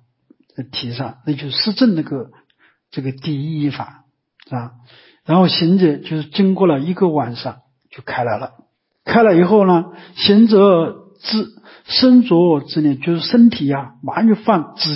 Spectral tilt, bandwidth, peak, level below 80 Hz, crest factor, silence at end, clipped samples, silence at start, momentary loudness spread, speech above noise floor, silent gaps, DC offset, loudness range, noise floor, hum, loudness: -10.5 dB/octave; 5.8 kHz; -2 dBFS; -58 dBFS; 14 dB; 0 s; under 0.1%; 0.6 s; 19 LU; 40 dB; none; under 0.1%; 8 LU; -55 dBFS; none; -15 LUFS